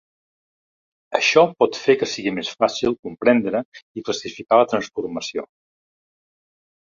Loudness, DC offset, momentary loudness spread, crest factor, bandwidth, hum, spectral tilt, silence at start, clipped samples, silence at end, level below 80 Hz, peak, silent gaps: -20 LUFS; under 0.1%; 12 LU; 20 dB; 7.6 kHz; none; -4 dB/octave; 1.1 s; under 0.1%; 1.4 s; -62 dBFS; -2 dBFS; 2.99-3.03 s, 3.65-3.72 s, 3.82-3.95 s